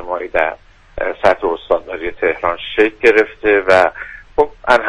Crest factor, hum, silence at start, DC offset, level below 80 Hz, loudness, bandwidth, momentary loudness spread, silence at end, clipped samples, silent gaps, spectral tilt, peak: 16 dB; none; 0 s; under 0.1%; -40 dBFS; -15 LUFS; 10.5 kHz; 12 LU; 0 s; under 0.1%; none; -4.5 dB/octave; 0 dBFS